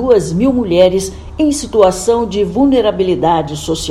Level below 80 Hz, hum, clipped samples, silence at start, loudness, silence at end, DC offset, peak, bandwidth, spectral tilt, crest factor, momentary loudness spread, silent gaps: -32 dBFS; none; 0.2%; 0 s; -13 LUFS; 0 s; under 0.1%; 0 dBFS; 13.5 kHz; -5.5 dB/octave; 12 dB; 7 LU; none